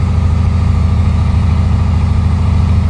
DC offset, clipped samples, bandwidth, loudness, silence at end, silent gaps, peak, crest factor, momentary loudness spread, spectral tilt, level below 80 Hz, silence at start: under 0.1%; under 0.1%; 8.8 kHz; -13 LUFS; 0 s; none; -2 dBFS; 10 dB; 0 LU; -8 dB/octave; -14 dBFS; 0 s